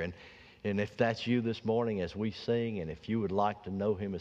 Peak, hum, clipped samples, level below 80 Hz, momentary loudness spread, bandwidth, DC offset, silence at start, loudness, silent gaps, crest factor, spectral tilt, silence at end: -16 dBFS; none; under 0.1%; -62 dBFS; 9 LU; 7.8 kHz; under 0.1%; 0 s; -33 LUFS; none; 18 dB; -7.5 dB/octave; 0 s